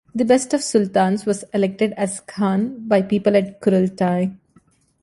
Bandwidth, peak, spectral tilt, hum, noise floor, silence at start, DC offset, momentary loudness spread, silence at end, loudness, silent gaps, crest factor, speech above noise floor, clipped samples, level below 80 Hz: 11.5 kHz; -4 dBFS; -6 dB/octave; none; -57 dBFS; 0.15 s; under 0.1%; 6 LU; 0.65 s; -19 LUFS; none; 16 dB; 38 dB; under 0.1%; -60 dBFS